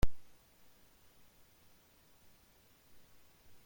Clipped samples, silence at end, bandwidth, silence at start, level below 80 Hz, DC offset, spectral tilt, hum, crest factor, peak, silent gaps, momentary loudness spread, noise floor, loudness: under 0.1%; 0.2 s; 16.5 kHz; 0 s; -48 dBFS; under 0.1%; -5.5 dB/octave; none; 22 dB; -16 dBFS; none; 0 LU; -66 dBFS; -58 LUFS